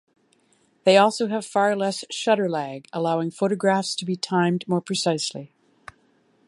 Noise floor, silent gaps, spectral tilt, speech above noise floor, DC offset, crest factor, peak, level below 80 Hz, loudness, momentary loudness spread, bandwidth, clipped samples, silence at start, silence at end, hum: -63 dBFS; none; -4.5 dB/octave; 41 dB; under 0.1%; 20 dB; -4 dBFS; -72 dBFS; -23 LUFS; 9 LU; 11.5 kHz; under 0.1%; 0.85 s; 1 s; none